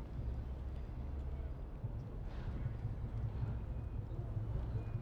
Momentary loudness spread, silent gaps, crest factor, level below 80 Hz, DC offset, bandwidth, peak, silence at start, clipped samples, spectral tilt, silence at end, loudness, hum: 5 LU; none; 12 dB; -44 dBFS; under 0.1%; 5.4 kHz; -30 dBFS; 0 s; under 0.1%; -9.5 dB/octave; 0 s; -44 LUFS; none